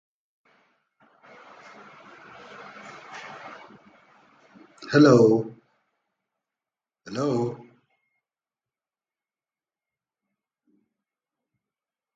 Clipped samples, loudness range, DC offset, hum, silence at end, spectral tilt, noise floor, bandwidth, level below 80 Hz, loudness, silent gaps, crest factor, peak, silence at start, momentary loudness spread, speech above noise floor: under 0.1%; 21 LU; under 0.1%; none; 4.6 s; -7 dB/octave; under -90 dBFS; 7.8 kHz; -70 dBFS; -21 LUFS; none; 24 dB; -4 dBFS; 2.85 s; 30 LU; over 71 dB